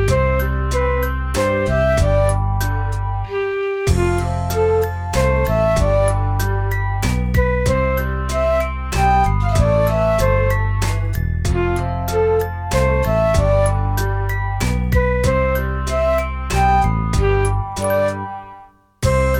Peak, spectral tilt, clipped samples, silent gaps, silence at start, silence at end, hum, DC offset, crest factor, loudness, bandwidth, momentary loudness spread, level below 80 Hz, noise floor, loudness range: -2 dBFS; -6 dB/octave; under 0.1%; none; 0 s; 0 s; none; under 0.1%; 14 dB; -18 LUFS; 17 kHz; 5 LU; -22 dBFS; -43 dBFS; 2 LU